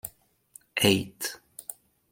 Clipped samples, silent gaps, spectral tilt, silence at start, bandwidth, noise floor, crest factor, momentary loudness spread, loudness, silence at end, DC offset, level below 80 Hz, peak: under 0.1%; none; -3.5 dB/octave; 0.05 s; 17 kHz; -56 dBFS; 24 dB; 18 LU; -26 LUFS; 0.4 s; under 0.1%; -64 dBFS; -6 dBFS